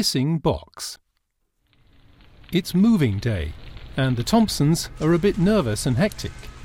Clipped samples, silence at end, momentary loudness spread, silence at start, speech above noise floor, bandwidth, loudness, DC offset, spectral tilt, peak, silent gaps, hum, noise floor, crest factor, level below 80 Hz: under 0.1%; 0 s; 15 LU; 0 s; 51 dB; 17 kHz; -21 LUFS; under 0.1%; -5.5 dB/octave; -6 dBFS; none; none; -72 dBFS; 16 dB; -40 dBFS